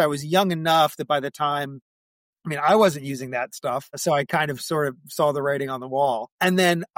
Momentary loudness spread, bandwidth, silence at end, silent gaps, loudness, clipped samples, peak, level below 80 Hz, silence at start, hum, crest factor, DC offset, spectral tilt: 10 LU; 16.5 kHz; 0.15 s; 1.82-2.33 s, 6.32-6.39 s; -23 LUFS; under 0.1%; -8 dBFS; -68 dBFS; 0 s; none; 16 dB; under 0.1%; -4.5 dB/octave